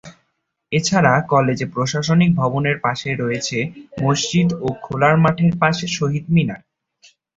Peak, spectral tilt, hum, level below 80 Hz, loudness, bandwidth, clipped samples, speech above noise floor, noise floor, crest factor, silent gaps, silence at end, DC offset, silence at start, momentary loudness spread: -2 dBFS; -5.5 dB/octave; none; -50 dBFS; -18 LUFS; 8 kHz; under 0.1%; 54 dB; -71 dBFS; 18 dB; none; 0.8 s; under 0.1%; 0.05 s; 8 LU